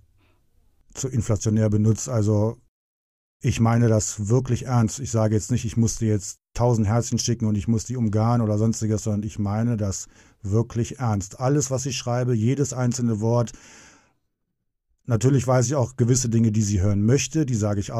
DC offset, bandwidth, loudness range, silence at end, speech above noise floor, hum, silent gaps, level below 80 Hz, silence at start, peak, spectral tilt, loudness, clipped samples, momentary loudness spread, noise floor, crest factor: under 0.1%; 12.5 kHz; 3 LU; 0 s; 55 dB; none; 2.68-3.40 s; -46 dBFS; 0.95 s; -6 dBFS; -6 dB/octave; -23 LUFS; under 0.1%; 7 LU; -77 dBFS; 16 dB